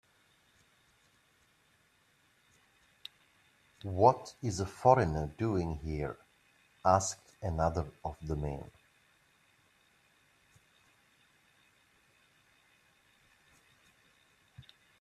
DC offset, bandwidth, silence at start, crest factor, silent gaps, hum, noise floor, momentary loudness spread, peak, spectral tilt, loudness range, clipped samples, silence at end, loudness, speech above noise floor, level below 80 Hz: under 0.1%; 13.5 kHz; 3.85 s; 26 dB; none; none; -70 dBFS; 23 LU; -10 dBFS; -6 dB/octave; 14 LU; under 0.1%; 0.4 s; -32 LUFS; 39 dB; -54 dBFS